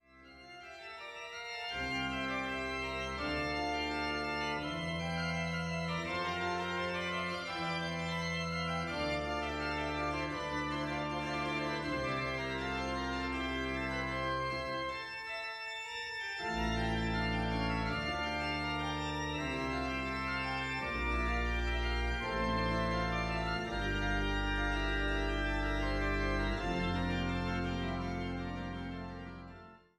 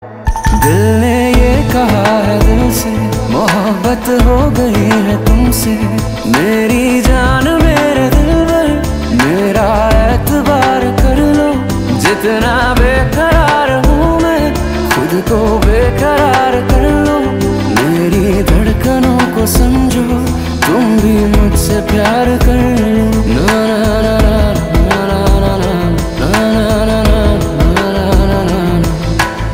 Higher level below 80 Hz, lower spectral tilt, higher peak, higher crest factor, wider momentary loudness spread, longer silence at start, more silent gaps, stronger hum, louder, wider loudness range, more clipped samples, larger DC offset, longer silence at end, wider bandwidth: second, -44 dBFS vs -16 dBFS; about the same, -5.5 dB/octave vs -6 dB/octave; second, -22 dBFS vs 0 dBFS; about the same, 14 dB vs 10 dB; about the same, 6 LU vs 4 LU; first, 0.15 s vs 0 s; neither; neither; second, -36 LUFS vs -11 LUFS; about the same, 2 LU vs 1 LU; neither; neither; first, 0.2 s vs 0 s; second, 12.5 kHz vs 16.5 kHz